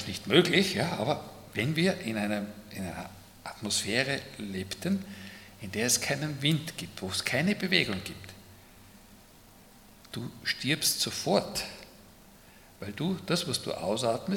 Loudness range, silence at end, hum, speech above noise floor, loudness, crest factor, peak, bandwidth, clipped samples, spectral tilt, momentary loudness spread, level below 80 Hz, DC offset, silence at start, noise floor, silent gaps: 4 LU; 0 s; none; 25 dB; -29 LUFS; 26 dB; -6 dBFS; 18 kHz; under 0.1%; -3.5 dB/octave; 17 LU; -62 dBFS; under 0.1%; 0 s; -55 dBFS; none